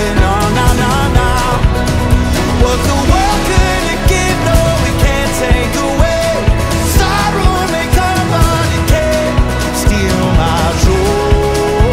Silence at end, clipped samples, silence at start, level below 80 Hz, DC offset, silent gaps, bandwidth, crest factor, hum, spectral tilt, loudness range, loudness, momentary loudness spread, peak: 0 s; under 0.1%; 0 s; -16 dBFS; under 0.1%; none; 16.5 kHz; 10 dB; none; -5 dB/octave; 1 LU; -12 LUFS; 2 LU; 0 dBFS